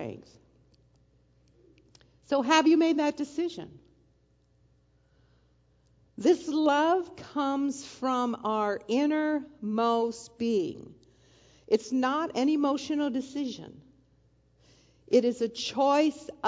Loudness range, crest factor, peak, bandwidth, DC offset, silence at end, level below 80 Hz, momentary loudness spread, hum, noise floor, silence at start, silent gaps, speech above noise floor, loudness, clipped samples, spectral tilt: 3 LU; 22 dB; -8 dBFS; 7.8 kHz; under 0.1%; 0 s; -68 dBFS; 11 LU; 60 Hz at -65 dBFS; -66 dBFS; 0 s; none; 39 dB; -28 LUFS; under 0.1%; -4.5 dB/octave